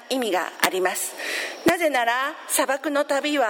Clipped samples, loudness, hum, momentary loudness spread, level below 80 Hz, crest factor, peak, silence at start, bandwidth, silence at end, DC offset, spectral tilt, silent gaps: under 0.1%; -23 LUFS; none; 6 LU; -66 dBFS; 22 dB; -2 dBFS; 0 s; 17 kHz; 0 s; under 0.1%; -2 dB/octave; none